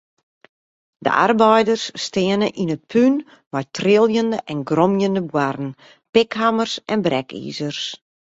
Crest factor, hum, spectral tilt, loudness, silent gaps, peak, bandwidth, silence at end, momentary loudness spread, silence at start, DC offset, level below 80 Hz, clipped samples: 18 dB; none; -5.5 dB/octave; -19 LUFS; 3.46-3.51 s, 6.09-6.13 s; -2 dBFS; 8 kHz; 0.4 s; 12 LU; 1 s; under 0.1%; -60 dBFS; under 0.1%